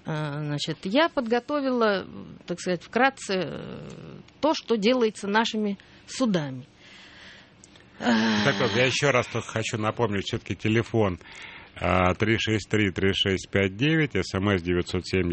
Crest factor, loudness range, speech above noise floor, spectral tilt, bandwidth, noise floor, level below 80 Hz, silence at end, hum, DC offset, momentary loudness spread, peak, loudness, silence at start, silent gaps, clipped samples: 22 dB; 3 LU; 27 dB; -5 dB/octave; 8.8 kHz; -52 dBFS; -54 dBFS; 0 s; none; under 0.1%; 15 LU; -4 dBFS; -25 LUFS; 0.05 s; none; under 0.1%